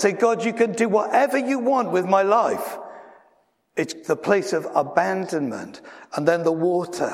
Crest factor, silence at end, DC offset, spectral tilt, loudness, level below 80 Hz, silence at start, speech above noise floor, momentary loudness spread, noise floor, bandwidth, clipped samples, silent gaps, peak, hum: 20 dB; 0 s; under 0.1%; -5.5 dB/octave; -22 LUFS; -74 dBFS; 0 s; 41 dB; 13 LU; -63 dBFS; 16 kHz; under 0.1%; none; -2 dBFS; none